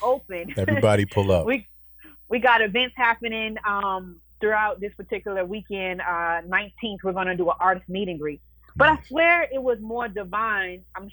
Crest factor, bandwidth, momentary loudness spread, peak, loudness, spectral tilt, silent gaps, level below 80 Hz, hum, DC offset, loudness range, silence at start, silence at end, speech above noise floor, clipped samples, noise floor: 18 dB; over 20 kHz; 13 LU; -6 dBFS; -23 LUFS; -6 dB/octave; none; -50 dBFS; none; under 0.1%; 4 LU; 0 s; 0 s; 25 dB; under 0.1%; -49 dBFS